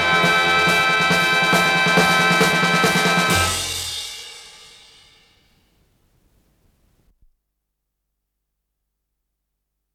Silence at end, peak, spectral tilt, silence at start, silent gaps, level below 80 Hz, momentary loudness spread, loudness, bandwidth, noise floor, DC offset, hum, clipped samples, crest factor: 5.45 s; -4 dBFS; -3 dB/octave; 0 s; none; -52 dBFS; 11 LU; -16 LUFS; 17 kHz; -77 dBFS; under 0.1%; 50 Hz at -60 dBFS; under 0.1%; 18 dB